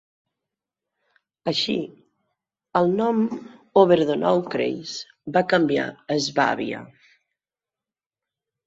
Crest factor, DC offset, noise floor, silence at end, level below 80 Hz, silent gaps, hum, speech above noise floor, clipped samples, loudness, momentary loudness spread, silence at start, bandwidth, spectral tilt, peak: 22 dB; under 0.1%; under -90 dBFS; 1.8 s; -66 dBFS; none; none; over 69 dB; under 0.1%; -22 LUFS; 13 LU; 1.45 s; 8 kHz; -5 dB/octave; -4 dBFS